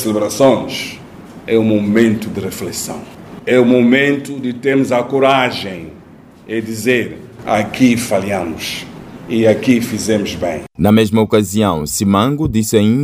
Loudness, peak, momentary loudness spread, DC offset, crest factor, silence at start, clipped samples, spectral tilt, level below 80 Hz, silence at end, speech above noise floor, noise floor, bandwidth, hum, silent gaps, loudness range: -15 LUFS; 0 dBFS; 15 LU; under 0.1%; 14 dB; 0 s; under 0.1%; -5.5 dB/octave; -44 dBFS; 0 s; 26 dB; -40 dBFS; 16 kHz; none; none; 3 LU